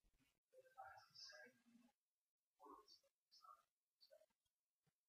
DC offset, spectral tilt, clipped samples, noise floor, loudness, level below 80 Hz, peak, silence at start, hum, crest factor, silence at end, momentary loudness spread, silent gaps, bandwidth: under 0.1%; -1.5 dB/octave; under 0.1%; under -90 dBFS; -64 LUFS; under -90 dBFS; -48 dBFS; 0.05 s; none; 22 dB; 0.2 s; 8 LU; 0.38-0.49 s, 1.95-2.56 s, 3.11-3.26 s, 3.71-3.97 s, 4.36-4.41 s, 4.51-4.83 s; 14.5 kHz